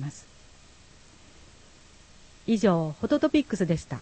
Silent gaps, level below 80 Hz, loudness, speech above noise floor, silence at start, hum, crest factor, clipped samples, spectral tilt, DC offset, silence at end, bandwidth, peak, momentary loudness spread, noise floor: none; -54 dBFS; -26 LUFS; 28 dB; 0 s; none; 20 dB; under 0.1%; -6.5 dB/octave; under 0.1%; 0 s; 8.8 kHz; -10 dBFS; 15 LU; -53 dBFS